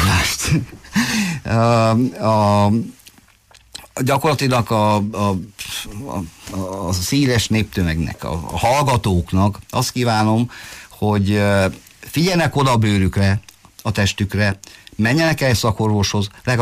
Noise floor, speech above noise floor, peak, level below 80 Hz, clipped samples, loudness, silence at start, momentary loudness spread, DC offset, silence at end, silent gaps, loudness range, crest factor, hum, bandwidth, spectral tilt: -50 dBFS; 33 dB; -6 dBFS; -38 dBFS; under 0.1%; -18 LUFS; 0 s; 12 LU; under 0.1%; 0 s; none; 2 LU; 12 dB; none; 15.5 kHz; -5.5 dB/octave